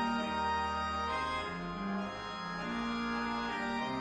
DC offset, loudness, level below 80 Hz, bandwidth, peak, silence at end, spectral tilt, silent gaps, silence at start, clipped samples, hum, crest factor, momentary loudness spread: under 0.1%; -36 LUFS; -54 dBFS; 10.5 kHz; -24 dBFS; 0 s; -5 dB/octave; none; 0 s; under 0.1%; none; 12 dB; 6 LU